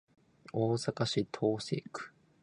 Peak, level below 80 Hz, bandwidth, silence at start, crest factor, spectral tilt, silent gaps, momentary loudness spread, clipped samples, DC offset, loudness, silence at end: -18 dBFS; -70 dBFS; 11 kHz; 0.55 s; 18 dB; -5.5 dB/octave; none; 13 LU; under 0.1%; under 0.1%; -34 LUFS; 0.35 s